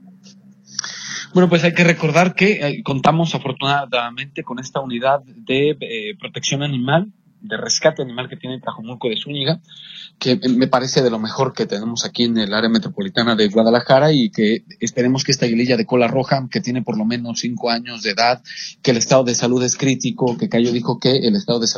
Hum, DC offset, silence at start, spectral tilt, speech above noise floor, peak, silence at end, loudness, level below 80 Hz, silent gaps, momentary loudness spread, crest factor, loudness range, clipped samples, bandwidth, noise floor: none; under 0.1%; 0.05 s; -4.5 dB/octave; 28 dB; 0 dBFS; 0 s; -18 LUFS; -58 dBFS; none; 12 LU; 18 dB; 5 LU; under 0.1%; 7.6 kHz; -46 dBFS